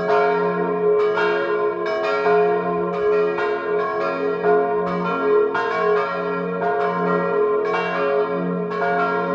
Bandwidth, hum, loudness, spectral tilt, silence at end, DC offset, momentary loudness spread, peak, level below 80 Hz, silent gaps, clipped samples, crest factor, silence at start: 7 kHz; none; -20 LUFS; -7.5 dB/octave; 0 s; under 0.1%; 4 LU; -6 dBFS; -60 dBFS; none; under 0.1%; 14 dB; 0 s